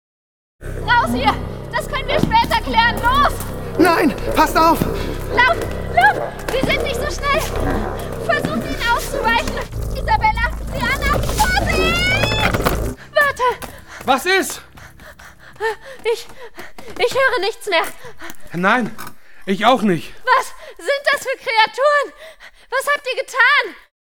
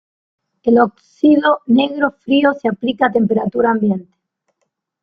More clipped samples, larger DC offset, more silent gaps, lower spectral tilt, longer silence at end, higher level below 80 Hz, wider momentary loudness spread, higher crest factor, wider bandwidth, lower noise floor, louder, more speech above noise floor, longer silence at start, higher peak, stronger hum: neither; first, 1% vs under 0.1%; neither; second, -4 dB/octave vs -8 dB/octave; second, 0.2 s vs 1 s; first, -30 dBFS vs -58 dBFS; first, 13 LU vs 6 LU; about the same, 18 dB vs 14 dB; first, 19 kHz vs 6 kHz; second, -41 dBFS vs -72 dBFS; about the same, -17 LUFS vs -15 LUFS; second, 24 dB vs 57 dB; about the same, 0.6 s vs 0.65 s; about the same, 0 dBFS vs -2 dBFS; neither